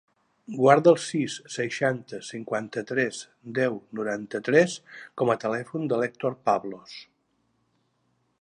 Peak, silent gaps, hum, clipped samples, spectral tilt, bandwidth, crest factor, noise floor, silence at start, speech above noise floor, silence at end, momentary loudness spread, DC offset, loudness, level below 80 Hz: -2 dBFS; none; none; under 0.1%; -5.5 dB/octave; 10.5 kHz; 24 dB; -71 dBFS; 0.5 s; 46 dB; 1.4 s; 18 LU; under 0.1%; -25 LUFS; -74 dBFS